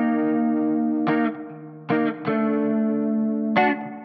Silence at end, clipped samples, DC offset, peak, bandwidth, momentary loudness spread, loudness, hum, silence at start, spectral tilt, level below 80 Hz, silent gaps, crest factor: 0 s; under 0.1%; under 0.1%; -6 dBFS; 5.4 kHz; 6 LU; -22 LUFS; none; 0 s; -9.5 dB/octave; -74 dBFS; none; 16 dB